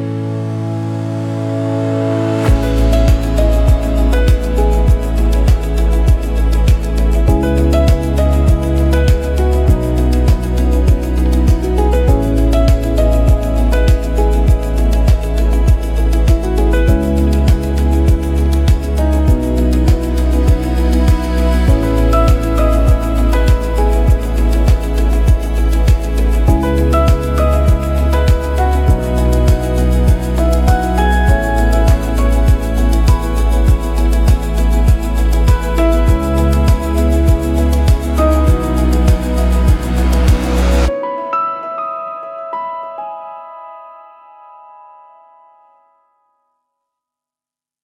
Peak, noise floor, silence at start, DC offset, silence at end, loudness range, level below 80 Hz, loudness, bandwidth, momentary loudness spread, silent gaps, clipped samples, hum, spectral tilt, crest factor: 0 dBFS; -89 dBFS; 0 s; under 0.1%; 3.9 s; 2 LU; -14 dBFS; -14 LUFS; 14.5 kHz; 4 LU; none; under 0.1%; none; -7 dB/octave; 10 dB